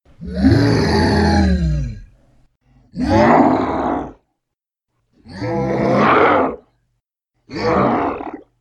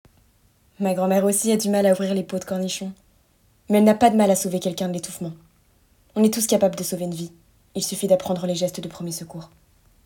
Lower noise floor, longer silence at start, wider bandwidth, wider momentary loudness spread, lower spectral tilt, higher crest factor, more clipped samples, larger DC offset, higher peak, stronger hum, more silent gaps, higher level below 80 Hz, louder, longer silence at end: first, -80 dBFS vs -60 dBFS; second, 0.2 s vs 0.8 s; second, 12 kHz vs 18 kHz; about the same, 17 LU vs 16 LU; first, -7 dB/octave vs -5 dB/octave; about the same, 18 dB vs 20 dB; neither; neither; about the same, 0 dBFS vs -2 dBFS; neither; neither; first, -30 dBFS vs -60 dBFS; first, -16 LUFS vs -22 LUFS; second, 0.2 s vs 0.6 s